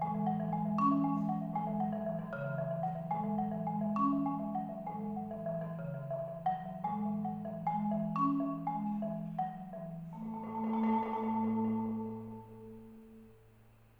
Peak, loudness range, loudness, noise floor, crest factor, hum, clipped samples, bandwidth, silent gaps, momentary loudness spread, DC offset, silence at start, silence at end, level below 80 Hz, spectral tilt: -20 dBFS; 3 LU; -36 LUFS; -62 dBFS; 16 dB; none; under 0.1%; 4.6 kHz; none; 12 LU; under 0.1%; 0 s; 0.3 s; -68 dBFS; -10.5 dB/octave